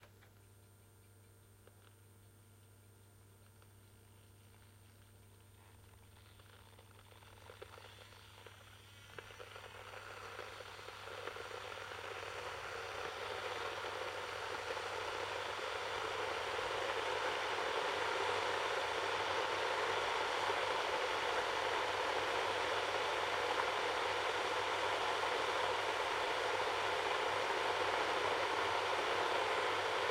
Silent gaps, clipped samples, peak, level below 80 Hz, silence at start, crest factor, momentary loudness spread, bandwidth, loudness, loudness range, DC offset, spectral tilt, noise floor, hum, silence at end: none; under 0.1%; -22 dBFS; -70 dBFS; 0 s; 20 dB; 16 LU; 16 kHz; -38 LUFS; 18 LU; under 0.1%; -2 dB/octave; -63 dBFS; none; 0 s